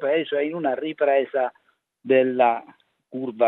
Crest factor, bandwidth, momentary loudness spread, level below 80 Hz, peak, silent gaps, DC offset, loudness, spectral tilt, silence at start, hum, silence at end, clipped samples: 18 dB; 4 kHz; 12 LU; -82 dBFS; -4 dBFS; none; under 0.1%; -23 LUFS; -8.5 dB/octave; 0 s; none; 0 s; under 0.1%